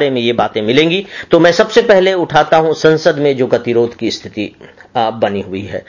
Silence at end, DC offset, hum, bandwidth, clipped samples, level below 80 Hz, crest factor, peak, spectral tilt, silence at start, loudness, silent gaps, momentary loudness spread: 0.05 s; under 0.1%; none; 7.4 kHz; under 0.1%; -48 dBFS; 12 dB; 0 dBFS; -5.5 dB/octave; 0 s; -12 LUFS; none; 12 LU